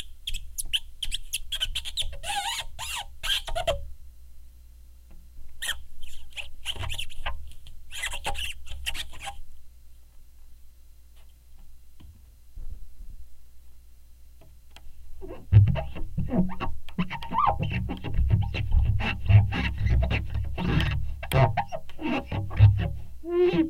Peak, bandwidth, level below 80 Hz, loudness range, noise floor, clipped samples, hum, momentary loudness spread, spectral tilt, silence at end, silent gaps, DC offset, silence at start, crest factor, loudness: -6 dBFS; 16 kHz; -34 dBFS; 12 LU; -48 dBFS; under 0.1%; 60 Hz at -50 dBFS; 19 LU; -5.5 dB/octave; 0 s; none; under 0.1%; 0 s; 20 dB; -28 LUFS